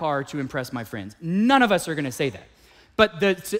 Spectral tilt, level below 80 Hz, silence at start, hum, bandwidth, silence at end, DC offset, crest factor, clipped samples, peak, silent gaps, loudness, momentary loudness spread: -5 dB/octave; -54 dBFS; 0 s; none; 16 kHz; 0 s; under 0.1%; 20 dB; under 0.1%; -4 dBFS; none; -23 LUFS; 14 LU